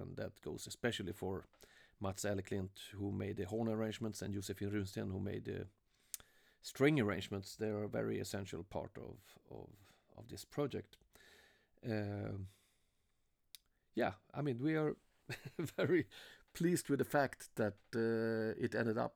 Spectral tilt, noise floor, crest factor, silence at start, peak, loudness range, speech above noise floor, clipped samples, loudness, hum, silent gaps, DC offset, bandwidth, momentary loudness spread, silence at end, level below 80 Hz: -6 dB/octave; -80 dBFS; 22 dB; 0 s; -18 dBFS; 8 LU; 39 dB; under 0.1%; -41 LUFS; none; none; under 0.1%; over 20 kHz; 18 LU; 0.05 s; -70 dBFS